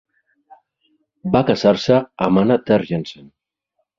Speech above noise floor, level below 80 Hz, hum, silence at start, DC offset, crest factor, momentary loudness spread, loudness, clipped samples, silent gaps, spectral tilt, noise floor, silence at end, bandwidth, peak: 57 dB; -52 dBFS; none; 1.25 s; under 0.1%; 20 dB; 11 LU; -17 LUFS; under 0.1%; none; -7 dB/octave; -73 dBFS; 0.85 s; 7.6 kHz; 0 dBFS